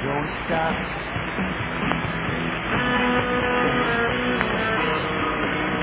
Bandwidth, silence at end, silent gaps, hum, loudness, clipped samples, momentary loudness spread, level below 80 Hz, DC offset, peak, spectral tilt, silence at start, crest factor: 4 kHz; 0 s; none; none; -23 LUFS; under 0.1%; 5 LU; -40 dBFS; under 0.1%; -4 dBFS; -9 dB/octave; 0 s; 20 dB